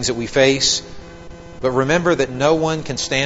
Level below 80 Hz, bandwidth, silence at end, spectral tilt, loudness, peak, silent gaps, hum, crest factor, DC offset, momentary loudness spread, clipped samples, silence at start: -42 dBFS; 8 kHz; 0 s; -3.5 dB/octave; -17 LUFS; 0 dBFS; none; none; 18 dB; 0.7%; 8 LU; under 0.1%; 0 s